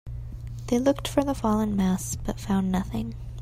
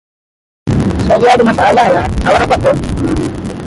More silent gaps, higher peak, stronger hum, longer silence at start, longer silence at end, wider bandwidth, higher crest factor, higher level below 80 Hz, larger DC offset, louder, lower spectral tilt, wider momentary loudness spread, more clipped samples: neither; second, -8 dBFS vs 0 dBFS; neither; second, 0.05 s vs 0.65 s; about the same, 0 s vs 0 s; first, 16 kHz vs 11.5 kHz; first, 18 dB vs 12 dB; second, -40 dBFS vs -26 dBFS; neither; second, -26 LUFS vs -11 LUFS; about the same, -6 dB/octave vs -6.5 dB/octave; first, 14 LU vs 8 LU; neither